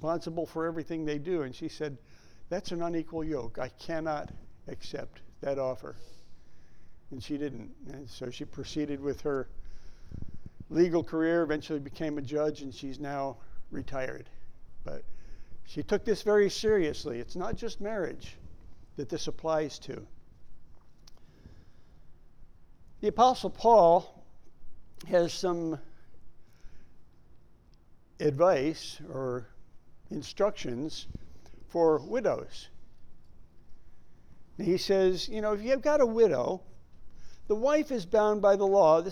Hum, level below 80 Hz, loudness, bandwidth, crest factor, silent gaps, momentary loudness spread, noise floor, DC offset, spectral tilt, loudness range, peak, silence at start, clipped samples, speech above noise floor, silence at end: none; -52 dBFS; -30 LUFS; 14.5 kHz; 22 dB; none; 21 LU; -56 dBFS; under 0.1%; -5.5 dB/octave; 11 LU; -8 dBFS; 0 s; under 0.1%; 27 dB; 0 s